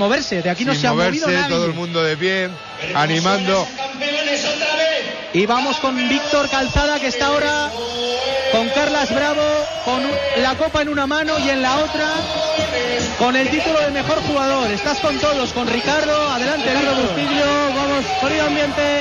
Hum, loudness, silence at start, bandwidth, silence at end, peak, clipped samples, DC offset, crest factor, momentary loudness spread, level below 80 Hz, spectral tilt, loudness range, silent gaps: none; -18 LUFS; 0 s; 11.5 kHz; 0 s; -6 dBFS; under 0.1%; under 0.1%; 12 dB; 4 LU; -40 dBFS; -4 dB/octave; 1 LU; none